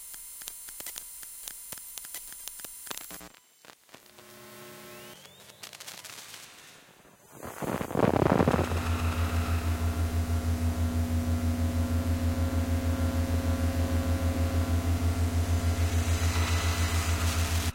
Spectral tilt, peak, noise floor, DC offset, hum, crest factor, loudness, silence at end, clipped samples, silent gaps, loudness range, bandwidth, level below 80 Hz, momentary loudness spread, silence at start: -5.5 dB/octave; -8 dBFS; -56 dBFS; under 0.1%; none; 22 dB; -30 LUFS; 0 s; under 0.1%; none; 17 LU; 17 kHz; -40 dBFS; 18 LU; 0 s